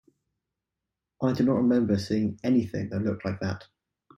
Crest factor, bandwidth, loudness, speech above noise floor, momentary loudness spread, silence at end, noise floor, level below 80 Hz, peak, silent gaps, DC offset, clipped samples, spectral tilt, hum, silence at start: 16 dB; 10.5 kHz; -27 LUFS; 61 dB; 9 LU; 0.55 s; -87 dBFS; -62 dBFS; -12 dBFS; none; under 0.1%; under 0.1%; -8 dB/octave; none; 1.2 s